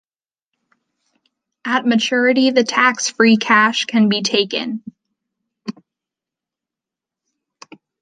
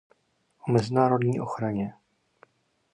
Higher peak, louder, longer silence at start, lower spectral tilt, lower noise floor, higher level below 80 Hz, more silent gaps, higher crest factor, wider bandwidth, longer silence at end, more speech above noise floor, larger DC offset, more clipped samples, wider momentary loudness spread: first, -2 dBFS vs -8 dBFS; first, -15 LUFS vs -26 LUFS; first, 1.65 s vs 0.65 s; second, -3.5 dB/octave vs -8 dB/octave; first, -87 dBFS vs -69 dBFS; second, -70 dBFS vs -64 dBFS; neither; about the same, 18 dB vs 20 dB; second, 9.4 kHz vs 10.5 kHz; first, 2.3 s vs 1.05 s; first, 71 dB vs 45 dB; neither; neither; first, 18 LU vs 12 LU